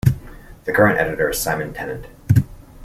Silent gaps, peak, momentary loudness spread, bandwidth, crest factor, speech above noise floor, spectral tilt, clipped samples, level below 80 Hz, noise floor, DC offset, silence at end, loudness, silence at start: none; -2 dBFS; 15 LU; 16 kHz; 18 dB; 19 dB; -6 dB/octave; under 0.1%; -38 dBFS; -39 dBFS; under 0.1%; 0 s; -19 LUFS; 0.05 s